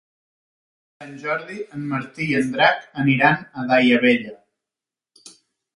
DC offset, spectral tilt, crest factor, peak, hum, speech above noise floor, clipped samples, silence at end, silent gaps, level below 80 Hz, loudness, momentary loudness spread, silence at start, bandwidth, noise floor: under 0.1%; -6 dB/octave; 22 dB; 0 dBFS; none; 69 dB; under 0.1%; 0.45 s; none; -62 dBFS; -19 LUFS; 15 LU; 1 s; 11.5 kHz; -89 dBFS